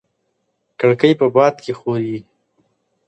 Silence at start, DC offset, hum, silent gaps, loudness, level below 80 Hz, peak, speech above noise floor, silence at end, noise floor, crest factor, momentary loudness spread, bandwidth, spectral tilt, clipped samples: 0.8 s; under 0.1%; none; none; -16 LUFS; -64 dBFS; 0 dBFS; 54 dB; 0.85 s; -69 dBFS; 18 dB; 12 LU; 8.6 kHz; -7 dB/octave; under 0.1%